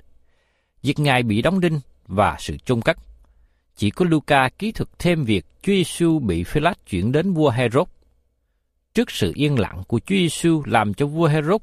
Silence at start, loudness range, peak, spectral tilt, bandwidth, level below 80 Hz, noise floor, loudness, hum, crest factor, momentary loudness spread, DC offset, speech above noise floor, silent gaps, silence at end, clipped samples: 0.85 s; 2 LU; -2 dBFS; -6 dB/octave; 15.5 kHz; -42 dBFS; -69 dBFS; -21 LUFS; none; 18 dB; 8 LU; under 0.1%; 50 dB; none; 0 s; under 0.1%